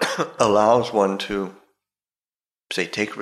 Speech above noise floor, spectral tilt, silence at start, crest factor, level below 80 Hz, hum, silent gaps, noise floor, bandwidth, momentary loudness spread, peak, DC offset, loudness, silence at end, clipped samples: over 70 dB; -4 dB/octave; 0 s; 18 dB; -56 dBFS; none; none; under -90 dBFS; 14.5 kHz; 12 LU; -4 dBFS; under 0.1%; -21 LUFS; 0 s; under 0.1%